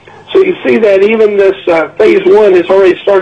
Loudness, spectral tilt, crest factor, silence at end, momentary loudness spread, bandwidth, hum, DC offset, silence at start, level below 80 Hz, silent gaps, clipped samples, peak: -8 LUFS; -6.5 dB/octave; 8 dB; 0 s; 5 LU; 7.8 kHz; none; under 0.1%; 0.3 s; -46 dBFS; none; under 0.1%; 0 dBFS